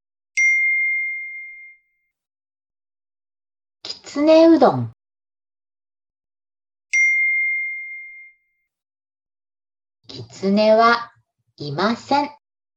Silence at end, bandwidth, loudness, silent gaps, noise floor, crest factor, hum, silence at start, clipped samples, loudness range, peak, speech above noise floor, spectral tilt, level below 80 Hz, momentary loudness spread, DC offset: 0.45 s; 8.8 kHz; -17 LUFS; none; -68 dBFS; 20 dB; none; 0.35 s; under 0.1%; 7 LU; -2 dBFS; 53 dB; -4.5 dB/octave; -70 dBFS; 22 LU; under 0.1%